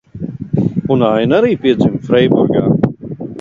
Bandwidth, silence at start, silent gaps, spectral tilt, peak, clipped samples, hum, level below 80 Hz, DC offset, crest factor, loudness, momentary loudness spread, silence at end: 7.4 kHz; 0.15 s; none; -9 dB/octave; 0 dBFS; under 0.1%; none; -44 dBFS; under 0.1%; 14 dB; -13 LUFS; 14 LU; 0 s